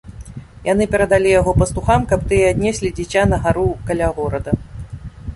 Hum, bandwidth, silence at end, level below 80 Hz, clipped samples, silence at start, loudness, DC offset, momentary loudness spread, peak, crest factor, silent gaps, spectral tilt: none; 11.5 kHz; 0 s; -30 dBFS; under 0.1%; 0.05 s; -17 LUFS; under 0.1%; 18 LU; -2 dBFS; 16 dB; none; -6 dB/octave